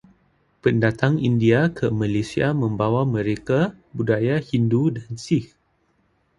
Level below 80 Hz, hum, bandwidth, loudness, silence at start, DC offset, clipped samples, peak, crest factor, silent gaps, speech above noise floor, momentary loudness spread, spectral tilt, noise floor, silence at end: -50 dBFS; none; 11 kHz; -21 LUFS; 0.65 s; under 0.1%; under 0.1%; 0 dBFS; 20 dB; none; 45 dB; 6 LU; -7.5 dB/octave; -65 dBFS; 0.95 s